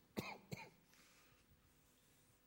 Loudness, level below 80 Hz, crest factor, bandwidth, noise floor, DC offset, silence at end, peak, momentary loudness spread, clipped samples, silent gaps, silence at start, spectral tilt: -53 LUFS; -80 dBFS; 28 dB; 16.5 kHz; -74 dBFS; under 0.1%; 0 s; -28 dBFS; 18 LU; under 0.1%; none; 0 s; -4.5 dB/octave